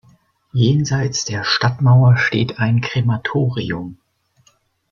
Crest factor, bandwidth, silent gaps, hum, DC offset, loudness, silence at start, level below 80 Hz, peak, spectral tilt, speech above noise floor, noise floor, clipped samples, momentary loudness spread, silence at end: 14 dB; 7.2 kHz; none; none; under 0.1%; -17 LUFS; 0.55 s; -50 dBFS; -2 dBFS; -5.5 dB/octave; 43 dB; -59 dBFS; under 0.1%; 12 LU; 0.95 s